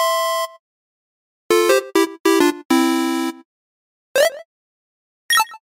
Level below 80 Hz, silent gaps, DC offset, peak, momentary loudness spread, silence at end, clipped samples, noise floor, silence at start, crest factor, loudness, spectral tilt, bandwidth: -72 dBFS; 0.59-1.50 s, 2.20-2.24 s, 2.65-2.69 s, 3.45-4.15 s, 4.45-5.29 s; under 0.1%; -2 dBFS; 8 LU; 0.2 s; under 0.1%; under -90 dBFS; 0 s; 18 dB; -18 LUFS; -1.5 dB/octave; 16.5 kHz